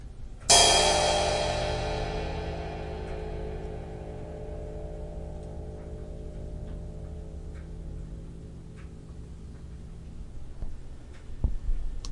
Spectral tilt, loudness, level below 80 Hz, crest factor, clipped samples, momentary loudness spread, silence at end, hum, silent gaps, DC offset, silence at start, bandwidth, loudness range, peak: -2.5 dB/octave; -26 LUFS; -38 dBFS; 26 dB; under 0.1%; 22 LU; 0 s; none; none; under 0.1%; 0 s; 11.5 kHz; 20 LU; -6 dBFS